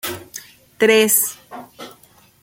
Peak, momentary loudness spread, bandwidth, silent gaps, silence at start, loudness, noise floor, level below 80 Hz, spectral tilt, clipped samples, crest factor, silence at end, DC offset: 0 dBFS; 25 LU; 17 kHz; none; 0.05 s; -15 LUFS; -51 dBFS; -64 dBFS; -2 dB/octave; under 0.1%; 20 dB; 0.5 s; under 0.1%